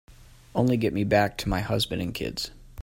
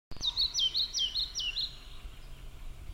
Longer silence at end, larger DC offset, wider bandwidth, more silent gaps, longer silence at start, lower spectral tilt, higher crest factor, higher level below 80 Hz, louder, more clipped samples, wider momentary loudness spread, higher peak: about the same, 0 s vs 0 s; neither; about the same, 16.5 kHz vs 16.5 kHz; neither; about the same, 0.1 s vs 0.1 s; first, -5.5 dB/octave vs 0 dB/octave; about the same, 20 dB vs 16 dB; about the same, -44 dBFS vs -48 dBFS; first, -26 LUFS vs -30 LUFS; neither; second, 9 LU vs 23 LU; first, -8 dBFS vs -20 dBFS